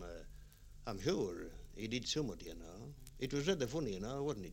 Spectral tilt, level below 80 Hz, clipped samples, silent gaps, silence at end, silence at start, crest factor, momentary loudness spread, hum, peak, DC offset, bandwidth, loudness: -5 dB/octave; -56 dBFS; under 0.1%; none; 0 s; 0 s; 20 dB; 17 LU; 50 Hz at -65 dBFS; -20 dBFS; under 0.1%; 16.5 kHz; -41 LUFS